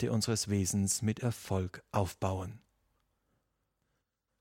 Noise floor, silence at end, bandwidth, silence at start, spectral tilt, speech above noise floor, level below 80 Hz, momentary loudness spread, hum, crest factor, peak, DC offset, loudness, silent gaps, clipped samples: -82 dBFS; 1.85 s; 16.5 kHz; 0 s; -5 dB/octave; 49 dB; -62 dBFS; 6 LU; none; 20 dB; -14 dBFS; under 0.1%; -33 LUFS; none; under 0.1%